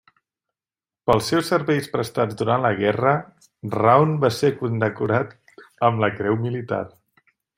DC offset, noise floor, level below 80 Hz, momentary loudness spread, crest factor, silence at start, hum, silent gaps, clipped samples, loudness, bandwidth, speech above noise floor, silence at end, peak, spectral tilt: under 0.1%; under -90 dBFS; -58 dBFS; 11 LU; 20 dB; 1.05 s; none; none; under 0.1%; -21 LUFS; 16 kHz; over 70 dB; 0.7 s; -2 dBFS; -6.5 dB/octave